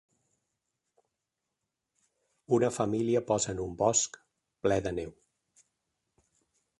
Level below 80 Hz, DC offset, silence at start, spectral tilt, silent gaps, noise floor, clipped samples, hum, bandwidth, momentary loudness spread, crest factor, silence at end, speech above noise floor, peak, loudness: -60 dBFS; under 0.1%; 2.5 s; -4.5 dB/octave; none; -86 dBFS; under 0.1%; none; 11.5 kHz; 9 LU; 22 dB; 1.7 s; 57 dB; -12 dBFS; -30 LUFS